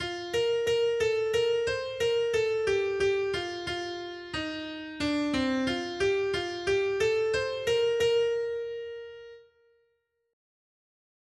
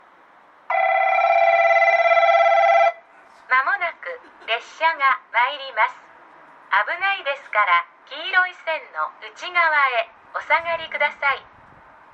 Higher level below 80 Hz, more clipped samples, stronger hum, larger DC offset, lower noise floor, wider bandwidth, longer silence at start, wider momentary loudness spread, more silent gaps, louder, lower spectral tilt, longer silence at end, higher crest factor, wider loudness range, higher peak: first, -58 dBFS vs -70 dBFS; neither; neither; neither; first, -75 dBFS vs -51 dBFS; first, 12.5 kHz vs 7.6 kHz; second, 0 s vs 0.7 s; second, 10 LU vs 13 LU; neither; second, -29 LUFS vs -19 LUFS; first, -4 dB/octave vs -1 dB/octave; first, 1.9 s vs 0.75 s; about the same, 14 dB vs 16 dB; about the same, 4 LU vs 5 LU; second, -16 dBFS vs -6 dBFS